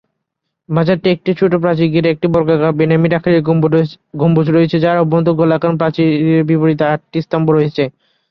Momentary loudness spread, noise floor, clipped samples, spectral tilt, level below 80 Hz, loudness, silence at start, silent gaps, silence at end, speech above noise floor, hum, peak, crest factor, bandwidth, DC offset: 5 LU; -75 dBFS; under 0.1%; -10 dB/octave; -50 dBFS; -13 LUFS; 0.7 s; none; 0.4 s; 62 dB; none; -2 dBFS; 12 dB; 5.8 kHz; under 0.1%